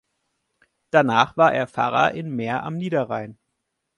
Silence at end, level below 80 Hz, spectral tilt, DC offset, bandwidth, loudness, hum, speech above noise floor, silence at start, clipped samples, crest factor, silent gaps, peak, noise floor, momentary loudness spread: 0.65 s; -62 dBFS; -6 dB/octave; under 0.1%; 11 kHz; -21 LUFS; none; 57 dB; 0.95 s; under 0.1%; 22 dB; none; 0 dBFS; -77 dBFS; 11 LU